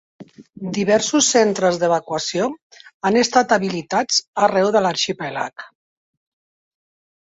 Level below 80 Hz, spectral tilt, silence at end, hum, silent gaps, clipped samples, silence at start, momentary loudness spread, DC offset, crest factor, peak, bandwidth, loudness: -62 dBFS; -3 dB/octave; 1.7 s; none; 2.62-2.70 s, 2.94-3.00 s, 4.27-4.33 s; under 0.1%; 0.2 s; 12 LU; under 0.1%; 18 dB; -2 dBFS; 8.2 kHz; -18 LUFS